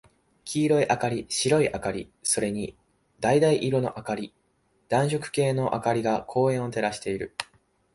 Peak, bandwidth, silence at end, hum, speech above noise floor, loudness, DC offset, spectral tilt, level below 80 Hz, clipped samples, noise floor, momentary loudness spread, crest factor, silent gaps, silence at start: -6 dBFS; 11.5 kHz; 0.5 s; none; 43 dB; -26 LUFS; under 0.1%; -5 dB/octave; -58 dBFS; under 0.1%; -68 dBFS; 11 LU; 20 dB; none; 0.45 s